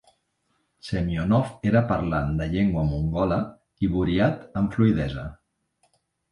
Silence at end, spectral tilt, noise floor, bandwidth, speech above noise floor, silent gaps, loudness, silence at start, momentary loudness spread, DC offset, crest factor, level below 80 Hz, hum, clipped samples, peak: 0.95 s; -8.5 dB/octave; -72 dBFS; 11 kHz; 49 dB; none; -24 LUFS; 0.85 s; 9 LU; under 0.1%; 18 dB; -40 dBFS; none; under 0.1%; -8 dBFS